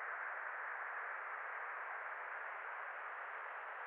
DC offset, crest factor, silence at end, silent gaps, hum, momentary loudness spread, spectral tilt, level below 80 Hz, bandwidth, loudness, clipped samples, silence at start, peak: under 0.1%; 12 dB; 0 s; none; none; 3 LU; 6 dB/octave; under -90 dBFS; 4.3 kHz; -45 LUFS; under 0.1%; 0 s; -34 dBFS